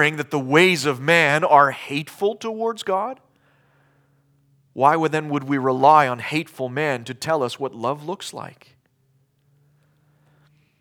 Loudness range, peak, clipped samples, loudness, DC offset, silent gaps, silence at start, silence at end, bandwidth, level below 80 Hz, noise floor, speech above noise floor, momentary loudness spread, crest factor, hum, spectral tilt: 10 LU; -2 dBFS; under 0.1%; -20 LUFS; under 0.1%; none; 0 s; 2.3 s; 19.5 kHz; -76 dBFS; -64 dBFS; 44 dB; 15 LU; 20 dB; none; -5 dB/octave